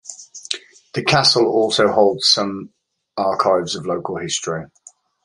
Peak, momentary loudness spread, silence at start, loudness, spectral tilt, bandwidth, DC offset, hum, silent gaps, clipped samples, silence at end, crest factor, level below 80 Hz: 0 dBFS; 15 LU; 0.05 s; -17 LUFS; -3.5 dB/octave; 11.5 kHz; under 0.1%; none; none; under 0.1%; 0.6 s; 20 dB; -56 dBFS